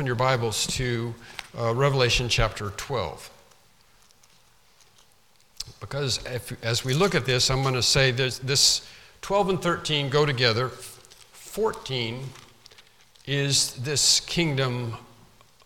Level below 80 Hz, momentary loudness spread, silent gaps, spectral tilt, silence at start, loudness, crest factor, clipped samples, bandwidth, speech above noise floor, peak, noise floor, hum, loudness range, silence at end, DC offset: -44 dBFS; 18 LU; none; -3.5 dB/octave; 0 s; -24 LUFS; 22 dB; under 0.1%; 17 kHz; 36 dB; -6 dBFS; -61 dBFS; none; 12 LU; 0.6 s; under 0.1%